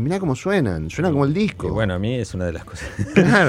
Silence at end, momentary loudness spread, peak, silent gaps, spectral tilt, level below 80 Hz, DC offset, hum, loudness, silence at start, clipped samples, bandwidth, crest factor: 0 s; 9 LU; 0 dBFS; none; -6.5 dB/octave; -42 dBFS; under 0.1%; none; -21 LUFS; 0 s; under 0.1%; 12.5 kHz; 18 dB